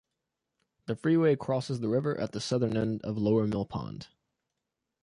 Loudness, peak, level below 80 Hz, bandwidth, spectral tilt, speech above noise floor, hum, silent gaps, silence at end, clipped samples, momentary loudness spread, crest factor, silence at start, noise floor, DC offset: -30 LUFS; -14 dBFS; -60 dBFS; 11 kHz; -7 dB/octave; 57 dB; none; none; 1 s; under 0.1%; 13 LU; 16 dB; 0.9 s; -86 dBFS; under 0.1%